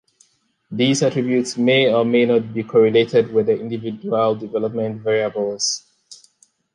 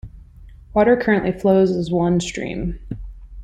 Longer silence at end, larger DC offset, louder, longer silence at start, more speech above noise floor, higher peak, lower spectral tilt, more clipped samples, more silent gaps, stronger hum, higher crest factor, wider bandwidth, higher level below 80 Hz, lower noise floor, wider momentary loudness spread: first, 0.6 s vs 0 s; neither; about the same, -18 LUFS vs -19 LUFS; first, 0.7 s vs 0.05 s; first, 41 dB vs 24 dB; about the same, -4 dBFS vs -4 dBFS; second, -4.5 dB/octave vs -6.5 dB/octave; neither; neither; neither; about the same, 16 dB vs 16 dB; first, 11 kHz vs 9.4 kHz; second, -64 dBFS vs -38 dBFS; first, -59 dBFS vs -42 dBFS; second, 9 LU vs 18 LU